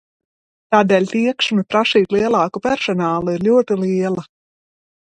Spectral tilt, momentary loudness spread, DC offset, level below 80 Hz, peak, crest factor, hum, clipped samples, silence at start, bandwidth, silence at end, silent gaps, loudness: -5.5 dB/octave; 5 LU; under 0.1%; -56 dBFS; 0 dBFS; 18 dB; none; under 0.1%; 0.7 s; 9.2 kHz; 0.8 s; none; -17 LUFS